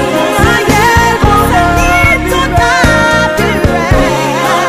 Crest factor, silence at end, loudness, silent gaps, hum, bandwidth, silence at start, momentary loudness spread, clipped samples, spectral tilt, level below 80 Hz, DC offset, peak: 8 dB; 0 s; -8 LUFS; none; none; 16.5 kHz; 0 s; 3 LU; 0.3%; -4.5 dB/octave; -18 dBFS; under 0.1%; 0 dBFS